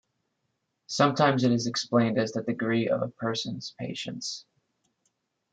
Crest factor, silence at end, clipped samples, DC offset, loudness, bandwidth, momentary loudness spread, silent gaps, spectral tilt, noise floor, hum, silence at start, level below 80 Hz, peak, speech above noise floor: 22 dB; 1.1 s; under 0.1%; under 0.1%; -27 LUFS; 9.2 kHz; 13 LU; none; -5 dB/octave; -79 dBFS; none; 0.9 s; -70 dBFS; -8 dBFS; 52 dB